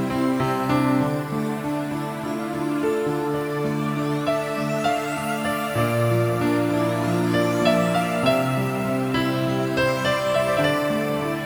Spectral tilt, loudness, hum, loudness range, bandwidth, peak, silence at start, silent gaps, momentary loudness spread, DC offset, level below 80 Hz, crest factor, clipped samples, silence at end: -6 dB/octave; -23 LUFS; none; 4 LU; over 20 kHz; -6 dBFS; 0 s; none; 6 LU; under 0.1%; -52 dBFS; 16 dB; under 0.1%; 0 s